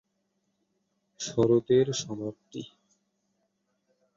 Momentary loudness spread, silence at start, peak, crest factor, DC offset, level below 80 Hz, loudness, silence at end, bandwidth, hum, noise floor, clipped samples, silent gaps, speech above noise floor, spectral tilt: 19 LU; 1.2 s; -12 dBFS; 20 dB; under 0.1%; -64 dBFS; -27 LUFS; 1.5 s; 7.6 kHz; none; -77 dBFS; under 0.1%; none; 50 dB; -5.5 dB/octave